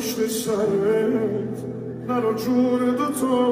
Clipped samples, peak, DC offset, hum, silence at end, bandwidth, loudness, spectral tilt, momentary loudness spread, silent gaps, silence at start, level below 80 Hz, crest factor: under 0.1%; -8 dBFS; under 0.1%; none; 0 s; 16 kHz; -23 LUFS; -5.5 dB/octave; 9 LU; none; 0 s; -58 dBFS; 14 dB